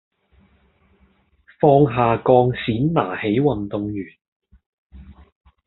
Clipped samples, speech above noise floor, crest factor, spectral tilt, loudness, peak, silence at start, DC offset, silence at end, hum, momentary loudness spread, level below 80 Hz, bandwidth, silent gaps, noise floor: under 0.1%; 41 dB; 20 dB; -6.5 dB/octave; -18 LUFS; -2 dBFS; 1.6 s; under 0.1%; 0.55 s; none; 12 LU; -48 dBFS; 4.2 kHz; 4.28-4.40 s, 4.66-4.90 s; -59 dBFS